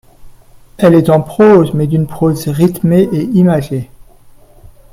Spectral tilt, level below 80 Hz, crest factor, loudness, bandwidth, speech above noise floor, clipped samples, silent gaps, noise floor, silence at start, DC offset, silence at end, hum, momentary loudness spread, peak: -8 dB/octave; -40 dBFS; 12 dB; -11 LUFS; 16 kHz; 30 dB; under 0.1%; none; -40 dBFS; 0.2 s; under 0.1%; 1.1 s; none; 8 LU; 0 dBFS